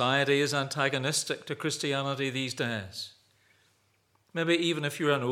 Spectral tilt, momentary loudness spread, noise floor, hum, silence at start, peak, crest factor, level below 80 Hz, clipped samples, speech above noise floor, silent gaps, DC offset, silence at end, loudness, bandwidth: -4 dB/octave; 10 LU; -70 dBFS; none; 0 s; -10 dBFS; 20 dB; -82 dBFS; under 0.1%; 41 dB; none; under 0.1%; 0 s; -29 LUFS; 17 kHz